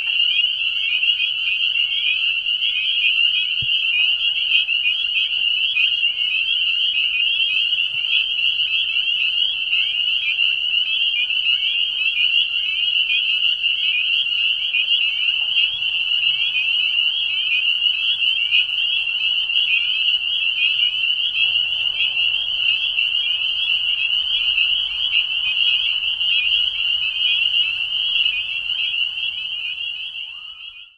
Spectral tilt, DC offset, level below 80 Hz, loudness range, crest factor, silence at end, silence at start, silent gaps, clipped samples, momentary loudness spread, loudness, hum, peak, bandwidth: 1 dB/octave; under 0.1%; -58 dBFS; 1 LU; 16 dB; 0.15 s; 0 s; none; under 0.1%; 3 LU; -16 LUFS; none; -4 dBFS; 10.5 kHz